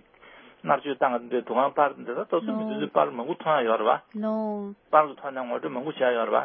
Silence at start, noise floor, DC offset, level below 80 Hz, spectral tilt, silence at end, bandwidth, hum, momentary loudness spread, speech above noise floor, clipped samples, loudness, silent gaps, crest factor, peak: 0.25 s; -52 dBFS; under 0.1%; -80 dBFS; -9.5 dB/octave; 0 s; 4.3 kHz; none; 9 LU; 26 dB; under 0.1%; -26 LUFS; none; 22 dB; -4 dBFS